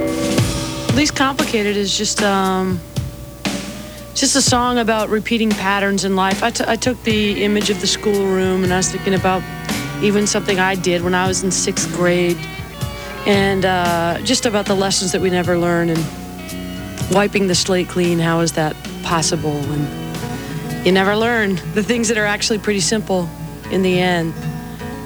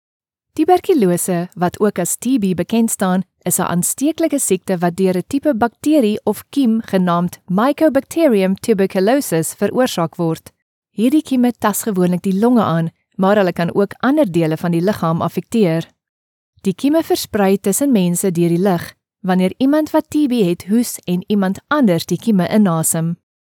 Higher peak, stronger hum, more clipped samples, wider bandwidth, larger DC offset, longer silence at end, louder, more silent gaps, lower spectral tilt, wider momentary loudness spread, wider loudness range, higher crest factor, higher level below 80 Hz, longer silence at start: about the same, -2 dBFS vs 0 dBFS; first, 60 Hz at -40 dBFS vs none; neither; about the same, over 20 kHz vs 19 kHz; neither; second, 0 s vs 0.35 s; about the same, -17 LUFS vs -16 LUFS; second, none vs 10.62-10.82 s, 16.09-16.53 s; second, -4 dB/octave vs -5.5 dB/octave; first, 11 LU vs 6 LU; about the same, 2 LU vs 2 LU; about the same, 16 dB vs 16 dB; first, -38 dBFS vs -60 dBFS; second, 0 s vs 0.55 s